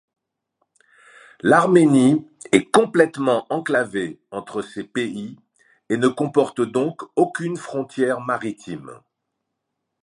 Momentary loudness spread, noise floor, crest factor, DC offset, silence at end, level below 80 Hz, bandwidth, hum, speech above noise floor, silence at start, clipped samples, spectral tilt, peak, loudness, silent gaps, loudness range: 15 LU; -79 dBFS; 22 dB; under 0.1%; 1.1 s; -66 dBFS; 11.5 kHz; none; 59 dB; 1.45 s; under 0.1%; -5.5 dB/octave; 0 dBFS; -20 LUFS; none; 6 LU